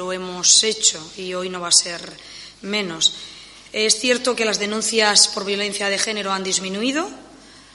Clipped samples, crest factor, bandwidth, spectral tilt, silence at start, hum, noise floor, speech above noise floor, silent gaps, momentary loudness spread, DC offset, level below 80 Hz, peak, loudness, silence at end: under 0.1%; 22 dB; 11.5 kHz; -0.5 dB/octave; 0 s; none; -45 dBFS; 24 dB; none; 18 LU; under 0.1%; -60 dBFS; 0 dBFS; -18 LUFS; 0.15 s